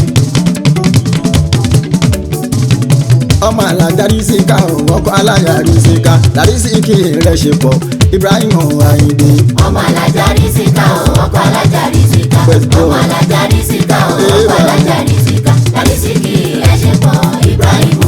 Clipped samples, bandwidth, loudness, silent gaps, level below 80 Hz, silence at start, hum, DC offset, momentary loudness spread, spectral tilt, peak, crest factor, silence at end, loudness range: 0.6%; 19.5 kHz; -9 LUFS; none; -24 dBFS; 0 s; none; under 0.1%; 3 LU; -6 dB/octave; 0 dBFS; 8 dB; 0 s; 2 LU